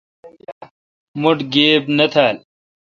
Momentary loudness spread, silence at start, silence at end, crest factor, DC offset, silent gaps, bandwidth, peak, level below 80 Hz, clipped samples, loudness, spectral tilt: 12 LU; 0.25 s; 0.5 s; 18 dB; under 0.1%; 0.52-0.61 s, 0.71-1.14 s; 7.4 kHz; 0 dBFS; -64 dBFS; under 0.1%; -15 LUFS; -6 dB/octave